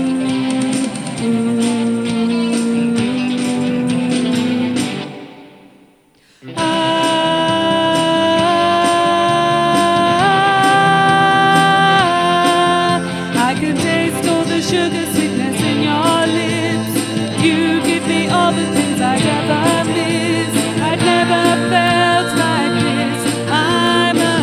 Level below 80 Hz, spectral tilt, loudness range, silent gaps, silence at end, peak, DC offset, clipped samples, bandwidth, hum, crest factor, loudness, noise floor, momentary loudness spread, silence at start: -52 dBFS; -4.5 dB/octave; 6 LU; none; 0 s; 0 dBFS; under 0.1%; under 0.1%; 15 kHz; none; 14 dB; -14 LUFS; -51 dBFS; 6 LU; 0 s